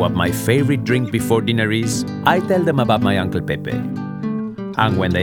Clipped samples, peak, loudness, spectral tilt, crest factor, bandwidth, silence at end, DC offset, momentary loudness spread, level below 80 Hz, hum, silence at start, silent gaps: under 0.1%; 0 dBFS; -18 LUFS; -6 dB/octave; 18 dB; 19 kHz; 0 s; under 0.1%; 8 LU; -48 dBFS; none; 0 s; none